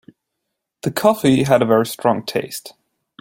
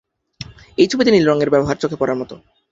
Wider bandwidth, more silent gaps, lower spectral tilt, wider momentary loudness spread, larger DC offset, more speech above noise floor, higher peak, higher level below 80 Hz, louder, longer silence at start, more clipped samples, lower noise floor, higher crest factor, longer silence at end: first, 17 kHz vs 7.8 kHz; neither; about the same, -5.5 dB/octave vs -5.5 dB/octave; second, 13 LU vs 22 LU; neither; first, 61 dB vs 22 dB; about the same, 0 dBFS vs -2 dBFS; second, -56 dBFS vs -48 dBFS; about the same, -17 LUFS vs -16 LUFS; first, 0.85 s vs 0.4 s; neither; first, -78 dBFS vs -37 dBFS; about the same, 18 dB vs 16 dB; first, 0.5 s vs 0.35 s